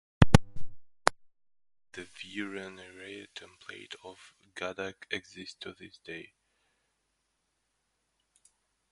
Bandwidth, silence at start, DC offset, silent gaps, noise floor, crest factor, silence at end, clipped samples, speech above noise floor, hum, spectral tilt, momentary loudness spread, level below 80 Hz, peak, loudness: 11.5 kHz; 0.2 s; under 0.1%; none; -79 dBFS; 32 dB; 2.7 s; under 0.1%; 36 dB; none; -5.5 dB/octave; 24 LU; -44 dBFS; 0 dBFS; -31 LUFS